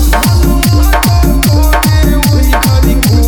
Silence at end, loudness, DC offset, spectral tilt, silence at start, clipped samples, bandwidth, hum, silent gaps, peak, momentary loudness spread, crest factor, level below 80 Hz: 0 s; -9 LUFS; under 0.1%; -5 dB/octave; 0 s; under 0.1%; 19.5 kHz; none; none; 0 dBFS; 0 LU; 8 dB; -10 dBFS